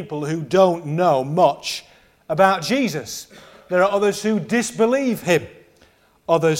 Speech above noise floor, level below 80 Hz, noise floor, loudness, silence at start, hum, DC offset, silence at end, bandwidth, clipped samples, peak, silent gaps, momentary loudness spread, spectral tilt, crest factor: 36 dB; -60 dBFS; -55 dBFS; -19 LUFS; 0 s; none; under 0.1%; 0 s; 16.5 kHz; under 0.1%; 0 dBFS; none; 11 LU; -5 dB/octave; 18 dB